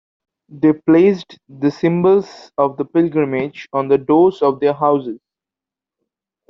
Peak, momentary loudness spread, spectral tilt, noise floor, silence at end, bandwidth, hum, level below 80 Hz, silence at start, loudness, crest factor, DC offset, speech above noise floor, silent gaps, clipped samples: -2 dBFS; 10 LU; -8.5 dB/octave; -88 dBFS; 1.35 s; 6.4 kHz; none; -60 dBFS; 0.55 s; -16 LUFS; 14 dB; under 0.1%; 72 dB; none; under 0.1%